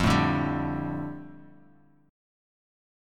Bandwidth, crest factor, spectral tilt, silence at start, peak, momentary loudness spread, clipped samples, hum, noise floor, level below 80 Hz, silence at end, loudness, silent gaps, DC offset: 15.5 kHz; 22 dB; -6 dB/octave; 0 s; -10 dBFS; 19 LU; under 0.1%; none; -59 dBFS; -46 dBFS; 1 s; -28 LUFS; none; under 0.1%